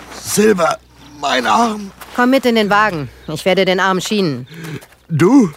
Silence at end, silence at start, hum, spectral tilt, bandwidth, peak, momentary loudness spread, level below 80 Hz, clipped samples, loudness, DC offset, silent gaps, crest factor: 0.05 s; 0 s; none; -4.5 dB/octave; 16 kHz; 0 dBFS; 14 LU; -48 dBFS; under 0.1%; -14 LUFS; under 0.1%; none; 14 dB